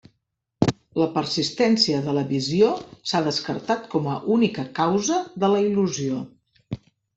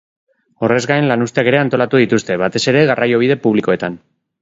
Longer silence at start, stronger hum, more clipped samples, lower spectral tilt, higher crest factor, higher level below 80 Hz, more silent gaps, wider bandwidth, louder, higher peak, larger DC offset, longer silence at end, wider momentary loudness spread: about the same, 0.6 s vs 0.6 s; neither; neither; about the same, -5 dB/octave vs -5.5 dB/octave; first, 20 dB vs 14 dB; about the same, -60 dBFS vs -56 dBFS; neither; about the same, 8.4 kHz vs 8 kHz; second, -23 LUFS vs -14 LUFS; second, -4 dBFS vs 0 dBFS; neither; about the same, 0.4 s vs 0.45 s; first, 9 LU vs 6 LU